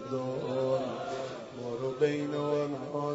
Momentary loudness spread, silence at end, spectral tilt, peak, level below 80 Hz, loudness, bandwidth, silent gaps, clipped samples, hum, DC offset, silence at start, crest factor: 8 LU; 0 s; -6.5 dB/octave; -16 dBFS; -70 dBFS; -33 LUFS; 8 kHz; none; under 0.1%; none; under 0.1%; 0 s; 18 dB